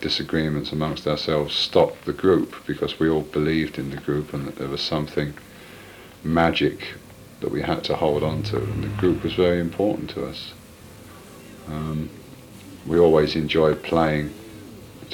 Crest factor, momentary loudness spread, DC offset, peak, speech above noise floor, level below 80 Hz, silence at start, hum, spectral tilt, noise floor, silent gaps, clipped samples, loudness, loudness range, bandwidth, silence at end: 20 dB; 22 LU; under 0.1%; -4 dBFS; 22 dB; -44 dBFS; 0 s; none; -6.5 dB/octave; -44 dBFS; none; under 0.1%; -23 LUFS; 4 LU; 19 kHz; 0 s